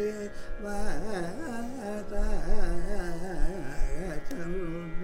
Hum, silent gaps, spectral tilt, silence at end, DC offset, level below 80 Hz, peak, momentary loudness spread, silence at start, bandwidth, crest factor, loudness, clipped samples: none; none; -6 dB/octave; 0 s; under 0.1%; -30 dBFS; -12 dBFS; 4 LU; 0 s; 10.5 kHz; 14 dB; -36 LUFS; under 0.1%